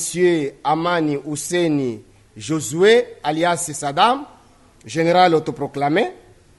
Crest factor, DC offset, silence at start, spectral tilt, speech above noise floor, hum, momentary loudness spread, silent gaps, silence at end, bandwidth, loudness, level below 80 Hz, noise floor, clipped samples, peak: 18 dB; under 0.1%; 0 s; -4.5 dB/octave; 31 dB; none; 11 LU; none; 0.45 s; 12 kHz; -19 LUFS; -58 dBFS; -50 dBFS; under 0.1%; -2 dBFS